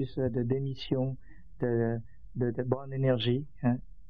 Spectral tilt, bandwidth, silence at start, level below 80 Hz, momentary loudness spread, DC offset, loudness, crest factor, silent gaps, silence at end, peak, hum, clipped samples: -9.5 dB/octave; 5.2 kHz; 0 s; -54 dBFS; 7 LU; 0.6%; -31 LUFS; 20 dB; none; 0.1 s; -12 dBFS; none; under 0.1%